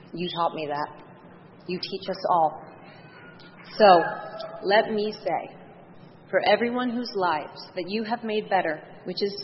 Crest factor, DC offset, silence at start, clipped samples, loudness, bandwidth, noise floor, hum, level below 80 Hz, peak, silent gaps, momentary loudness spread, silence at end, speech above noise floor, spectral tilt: 22 dB; under 0.1%; 0.05 s; under 0.1%; -25 LUFS; 6 kHz; -49 dBFS; none; -70 dBFS; -4 dBFS; none; 18 LU; 0 s; 24 dB; -7.5 dB/octave